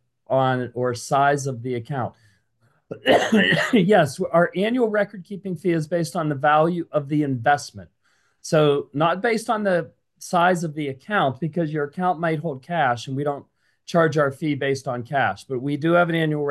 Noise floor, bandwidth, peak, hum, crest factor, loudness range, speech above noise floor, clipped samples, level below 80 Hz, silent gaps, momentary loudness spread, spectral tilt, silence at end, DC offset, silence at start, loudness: -65 dBFS; 12.5 kHz; -4 dBFS; none; 18 dB; 4 LU; 44 dB; under 0.1%; -64 dBFS; none; 10 LU; -6 dB/octave; 0 s; under 0.1%; 0.3 s; -22 LUFS